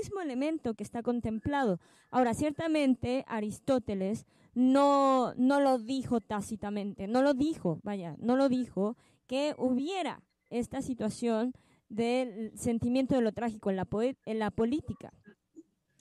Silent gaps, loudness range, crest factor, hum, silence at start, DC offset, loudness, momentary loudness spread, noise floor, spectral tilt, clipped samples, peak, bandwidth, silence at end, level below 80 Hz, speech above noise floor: none; 5 LU; 16 dB; none; 0 s; under 0.1%; -31 LUFS; 10 LU; -58 dBFS; -6 dB/octave; under 0.1%; -16 dBFS; 12.5 kHz; 0.4 s; -60 dBFS; 28 dB